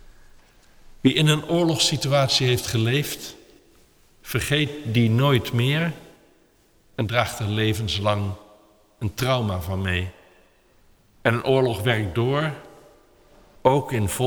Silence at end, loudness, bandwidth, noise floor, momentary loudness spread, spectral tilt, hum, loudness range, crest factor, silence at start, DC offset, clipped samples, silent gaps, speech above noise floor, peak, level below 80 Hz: 0 s; -22 LUFS; over 20 kHz; -59 dBFS; 11 LU; -5 dB/octave; none; 5 LU; 20 dB; 1.05 s; under 0.1%; under 0.1%; none; 37 dB; -4 dBFS; -48 dBFS